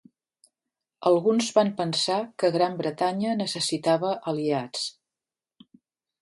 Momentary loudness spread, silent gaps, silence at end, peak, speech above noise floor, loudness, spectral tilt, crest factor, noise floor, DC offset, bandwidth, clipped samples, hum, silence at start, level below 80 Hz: 6 LU; none; 1.3 s; -6 dBFS; over 65 dB; -25 LUFS; -4.5 dB/octave; 20 dB; under -90 dBFS; under 0.1%; 11.5 kHz; under 0.1%; none; 1 s; -74 dBFS